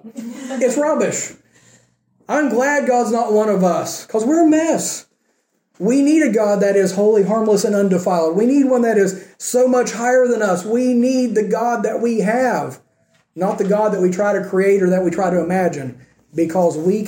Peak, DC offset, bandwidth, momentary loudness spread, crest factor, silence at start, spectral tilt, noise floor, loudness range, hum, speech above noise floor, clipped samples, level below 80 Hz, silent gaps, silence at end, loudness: -4 dBFS; under 0.1%; 17 kHz; 8 LU; 12 dB; 0.05 s; -5.5 dB/octave; -66 dBFS; 3 LU; none; 50 dB; under 0.1%; -64 dBFS; none; 0 s; -16 LUFS